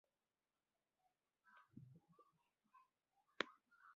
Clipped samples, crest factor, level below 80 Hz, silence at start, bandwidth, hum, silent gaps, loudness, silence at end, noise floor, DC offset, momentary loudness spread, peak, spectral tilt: under 0.1%; 40 dB; under -90 dBFS; 1.45 s; 4.8 kHz; none; none; -50 LUFS; 0 s; under -90 dBFS; under 0.1%; 19 LU; -22 dBFS; -1 dB/octave